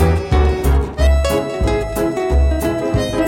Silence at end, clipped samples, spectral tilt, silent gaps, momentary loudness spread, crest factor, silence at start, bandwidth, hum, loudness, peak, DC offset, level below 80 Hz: 0 s; under 0.1%; -6.5 dB/octave; none; 3 LU; 12 dB; 0 s; 16.5 kHz; none; -17 LUFS; -4 dBFS; under 0.1%; -18 dBFS